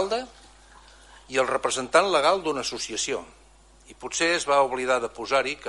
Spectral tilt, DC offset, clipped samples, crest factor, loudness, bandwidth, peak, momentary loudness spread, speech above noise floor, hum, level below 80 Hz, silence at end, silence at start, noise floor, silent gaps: -2 dB/octave; under 0.1%; under 0.1%; 20 dB; -24 LUFS; 11.5 kHz; -6 dBFS; 10 LU; 29 dB; none; -56 dBFS; 0 s; 0 s; -53 dBFS; none